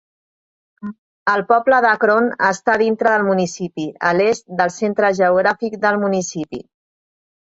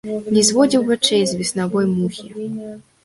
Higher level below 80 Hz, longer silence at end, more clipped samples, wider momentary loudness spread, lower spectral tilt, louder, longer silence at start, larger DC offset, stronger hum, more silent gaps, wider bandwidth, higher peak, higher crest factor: about the same, -62 dBFS vs -58 dBFS; first, 1 s vs 0.25 s; neither; about the same, 14 LU vs 15 LU; about the same, -5 dB/octave vs -4 dB/octave; about the same, -17 LUFS vs -17 LUFS; first, 0.85 s vs 0.05 s; neither; neither; first, 0.98-1.26 s vs none; second, 8 kHz vs 11.5 kHz; about the same, -2 dBFS vs -2 dBFS; about the same, 16 dB vs 16 dB